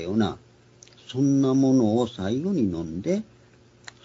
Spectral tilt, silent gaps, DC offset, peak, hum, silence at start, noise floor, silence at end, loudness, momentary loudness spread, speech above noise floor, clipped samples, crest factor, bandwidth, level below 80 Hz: -7 dB/octave; none; under 0.1%; -10 dBFS; none; 0 s; -55 dBFS; 0.8 s; -24 LUFS; 10 LU; 32 dB; under 0.1%; 14 dB; 7.8 kHz; -58 dBFS